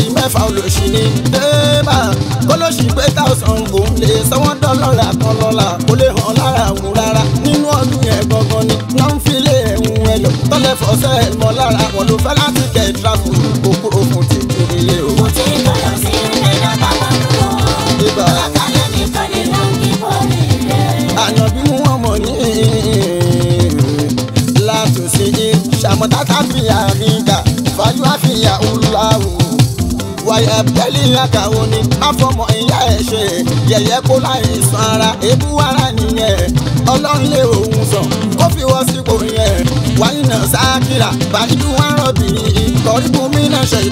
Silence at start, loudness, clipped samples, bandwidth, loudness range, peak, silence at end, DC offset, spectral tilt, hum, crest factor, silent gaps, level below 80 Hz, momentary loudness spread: 0 s; -12 LUFS; under 0.1%; 16.5 kHz; 1 LU; 0 dBFS; 0 s; under 0.1%; -5 dB/octave; none; 12 dB; none; -26 dBFS; 3 LU